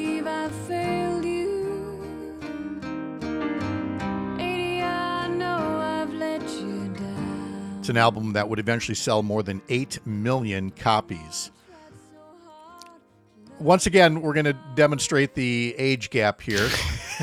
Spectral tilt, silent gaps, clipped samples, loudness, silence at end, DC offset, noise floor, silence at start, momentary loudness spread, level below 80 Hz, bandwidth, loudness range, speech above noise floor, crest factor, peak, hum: -5 dB/octave; none; under 0.1%; -25 LUFS; 0 s; under 0.1%; -55 dBFS; 0 s; 12 LU; -50 dBFS; 17.5 kHz; 8 LU; 32 dB; 22 dB; -4 dBFS; none